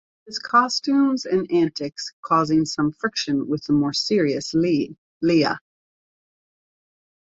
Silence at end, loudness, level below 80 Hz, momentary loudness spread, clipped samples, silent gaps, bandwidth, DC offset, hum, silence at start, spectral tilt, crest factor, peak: 1.65 s; -21 LUFS; -60 dBFS; 11 LU; under 0.1%; 2.13-2.23 s, 4.98-5.21 s; 8 kHz; under 0.1%; none; 0.25 s; -5 dB/octave; 16 dB; -6 dBFS